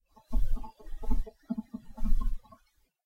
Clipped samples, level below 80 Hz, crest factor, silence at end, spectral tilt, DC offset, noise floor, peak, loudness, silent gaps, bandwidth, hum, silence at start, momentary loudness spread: under 0.1%; -30 dBFS; 16 dB; 0.7 s; -8.5 dB/octave; under 0.1%; -69 dBFS; -12 dBFS; -39 LUFS; none; 2 kHz; none; 0.3 s; 10 LU